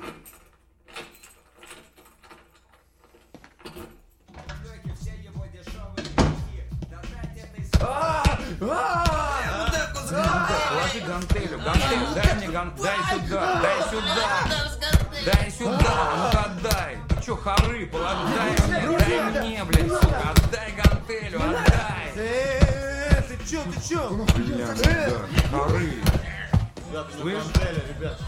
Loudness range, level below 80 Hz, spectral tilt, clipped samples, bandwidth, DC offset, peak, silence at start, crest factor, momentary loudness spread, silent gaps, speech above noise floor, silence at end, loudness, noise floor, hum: 9 LU; -30 dBFS; -5 dB/octave; under 0.1%; 16.5 kHz; under 0.1%; -2 dBFS; 0 s; 22 dB; 16 LU; none; 36 dB; 0 s; -24 LUFS; -58 dBFS; none